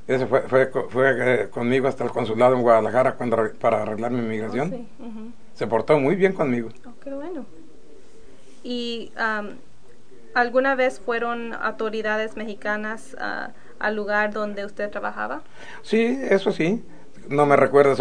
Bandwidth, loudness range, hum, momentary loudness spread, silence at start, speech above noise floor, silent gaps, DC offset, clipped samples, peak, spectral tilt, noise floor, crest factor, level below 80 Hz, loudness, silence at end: 10 kHz; 7 LU; none; 17 LU; 0.1 s; 30 dB; none; 2%; under 0.1%; -2 dBFS; -6.5 dB/octave; -52 dBFS; 20 dB; -60 dBFS; -22 LUFS; 0 s